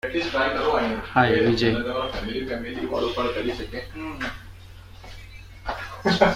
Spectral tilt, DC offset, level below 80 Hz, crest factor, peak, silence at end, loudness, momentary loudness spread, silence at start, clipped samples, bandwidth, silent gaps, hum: -6 dB/octave; under 0.1%; -42 dBFS; 22 dB; -2 dBFS; 0 s; -25 LUFS; 23 LU; 0.05 s; under 0.1%; 15.5 kHz; none; none